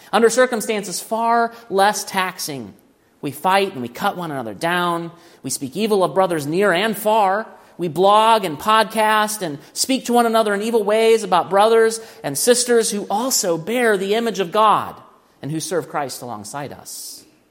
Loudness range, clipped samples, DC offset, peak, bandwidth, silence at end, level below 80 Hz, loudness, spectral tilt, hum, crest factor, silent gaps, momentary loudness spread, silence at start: 5 LU; under 0.1%; under 0.1%; 0 dBFS; 16.5 kHz; 0.3 s; -68 dBFS; -18 LUFS; -3 dB/octave; none; 18 dB; none; 15 LU; 0.15 s